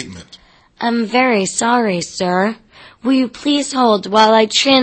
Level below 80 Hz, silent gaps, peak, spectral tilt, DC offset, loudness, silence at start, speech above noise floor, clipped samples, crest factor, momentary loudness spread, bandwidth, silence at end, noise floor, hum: -56 dBFS; none; 0 dBFS; -3.5 dB/octave; under 0.1%; -15 LUFS; 0 s; 31 dB; under 0.1%; 16 dB; 10 LU; 8.8 kHz; 0 s; -45 dBFS; none